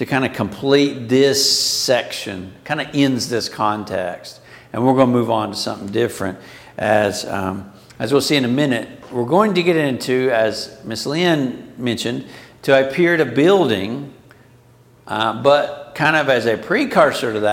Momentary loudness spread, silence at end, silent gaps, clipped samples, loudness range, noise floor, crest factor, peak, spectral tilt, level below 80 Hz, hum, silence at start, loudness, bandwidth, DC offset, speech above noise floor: 13 LU; 0 s; none; under 0.1%; 3 LU; -49 dBFS; 18 dB; 0 dBFS; -4.5 dB/octave; -58 dBFS; none; 0 s; -18 LUFS; 17 kHz; under 0.1%; 32 dB